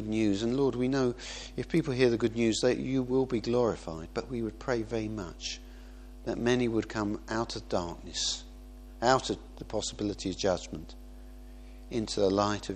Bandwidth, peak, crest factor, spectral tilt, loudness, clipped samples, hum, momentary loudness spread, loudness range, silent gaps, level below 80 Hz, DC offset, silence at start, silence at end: 11.5 kHz; -8 dBFS; 24 dB; -5 dB/octave; -31 LUFS; under 0.1%; none; 22 LU; 5 LU; none; -48 dBFS; under 0.1%; 0 s; 0 s